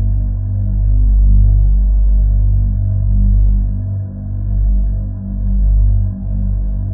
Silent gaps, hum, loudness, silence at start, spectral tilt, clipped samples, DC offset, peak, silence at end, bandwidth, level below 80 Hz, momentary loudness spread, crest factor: none; 50 Hz at -25 dBFS; -16 LUFS; 0 s; -14.5 dB/octave; under 0.1%; under 0.1%; -2 dBFS; 0 s; 1.1 kHz; -12 dBFS; 8 LU; 10 dB